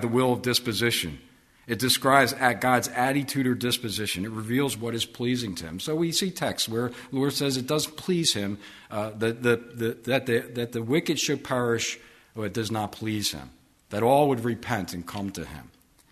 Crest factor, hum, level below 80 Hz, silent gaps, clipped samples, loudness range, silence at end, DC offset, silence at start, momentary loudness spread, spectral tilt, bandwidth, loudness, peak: 22 dB; none; -58 dBFS; none; under 0.1%; 4 LU; 0.45 s; under 0.1%; 0 s; 12 LU; -4 dB/octave; 13.5 kHz; -26 LUFS; -4 dBFS